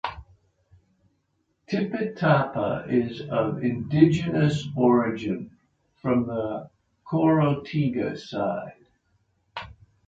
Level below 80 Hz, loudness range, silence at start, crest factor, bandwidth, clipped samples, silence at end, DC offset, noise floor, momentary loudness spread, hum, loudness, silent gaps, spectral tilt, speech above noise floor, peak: -56 dBFS; 4 LU; 0.05 s; 22 dB; 7.8 kHz; under 0.1%; 0.35 s; under 0.1%; -72 dBFS; 16 LU; none; -25 LUFS; none; -8 dB/octave; 49 dB; -4 dBFS